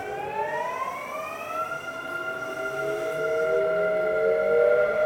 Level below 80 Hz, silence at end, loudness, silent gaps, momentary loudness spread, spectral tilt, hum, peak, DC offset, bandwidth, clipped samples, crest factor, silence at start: -62 dBFS; 0 s; -26 LUFS; none; 11 LU; -4.5 dB/octave; none; -10 dBFS; under 0.1%; 18 kHz; under 0.1%; 16 dB; 0 s